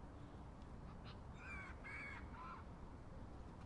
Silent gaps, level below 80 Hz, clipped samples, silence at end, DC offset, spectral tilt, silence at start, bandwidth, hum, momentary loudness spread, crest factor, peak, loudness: none; -60 dBFS; under 0.1%; 0 s; under 0.1%; -6.5 dB/octave; 0 s; 11 kHz; none; 7 LU; 14 dB; -40 dBFS; -54 LUFS